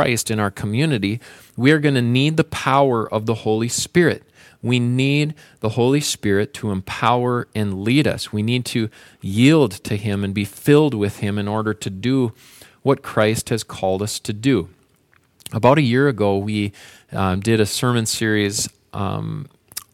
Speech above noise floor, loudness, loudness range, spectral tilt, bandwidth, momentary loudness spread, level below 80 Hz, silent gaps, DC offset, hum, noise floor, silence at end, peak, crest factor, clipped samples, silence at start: 40 dB; -19 LUFS; 3 LU; -5.5 dB/octave; 16.5 kHz; 10 LU; -54 dBFS; none; under 0.1%; none; -59 dBFS; 0.15 s; -2 dBFS; 18 dB; under 0.1%; 0 s